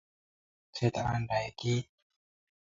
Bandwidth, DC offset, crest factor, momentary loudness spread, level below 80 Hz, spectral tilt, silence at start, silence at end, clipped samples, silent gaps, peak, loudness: 7.6 kHz; under 0.1%; 22 dB; 10 LU; -58 dBFS; -6 dB/octave; 0.75 s; 0.9 s; under 0.1%; none; -14 dBFS; -33 LUFS